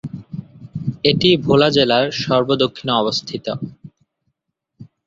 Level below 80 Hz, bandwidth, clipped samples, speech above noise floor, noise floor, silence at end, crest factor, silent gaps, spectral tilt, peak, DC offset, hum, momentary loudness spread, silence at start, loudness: -52 dBFS; 7.8 kHz; under 0.1%; 59 dB; -76 dBFS; 0.2 s; 18 dB; none; -5.5 dB/octave; 0 dBFS; under 0.1%; none; 19 LU; 0.05 s; -17 LUFS